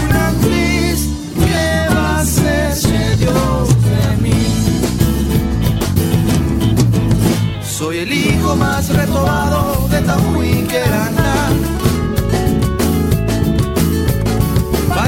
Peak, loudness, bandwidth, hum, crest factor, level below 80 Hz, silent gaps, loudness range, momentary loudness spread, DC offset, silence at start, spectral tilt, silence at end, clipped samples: 0 dBFS; -15 LUFS; 16.5 kHz; none; 12 dB; -22 dBFS; none; 1 LU; 3 LU; under 0.1%; 0 s; -5.5 dB/octave; 0 s; under 0.1%